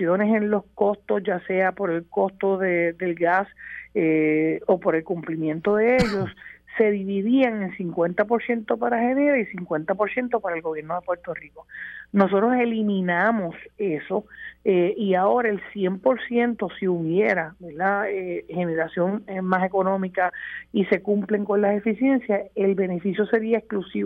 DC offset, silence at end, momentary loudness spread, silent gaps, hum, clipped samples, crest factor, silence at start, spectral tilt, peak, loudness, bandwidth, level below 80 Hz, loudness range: under 0.1%; 0 s; 9 LU; none; none; under 0.1%; 18 dB; 0 s; -8 dB/octave; -6 dBFS; -23 LUFS; 8.6 kHz; -56 dBFS; 2 LU